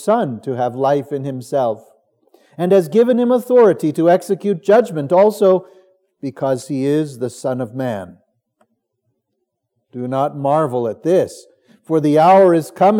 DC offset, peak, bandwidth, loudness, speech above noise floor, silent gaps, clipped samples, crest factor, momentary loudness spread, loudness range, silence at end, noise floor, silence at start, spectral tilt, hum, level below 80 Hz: under 0.1%; -2 dBFS; 17 kHz; -16 LUFS; 58 dB; none; under 0.1%; 14 dB; 12 LU; 10 LU; 0 s; -74 dBFS; 0 s; -7 dB/octave; none; -76 dBFS